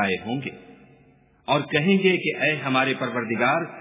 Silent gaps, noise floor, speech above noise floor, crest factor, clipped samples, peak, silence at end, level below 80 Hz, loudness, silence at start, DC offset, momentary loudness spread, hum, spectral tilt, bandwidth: none; -57 dBFS; 33 dB; 20 dB; under 0.1%; -4 dBFS; 0 s; -64 dBFS; -22 LUFS; 0 s; under 0.1%; 11 LU; none; -9.5 dB/octave; 3.9 kHz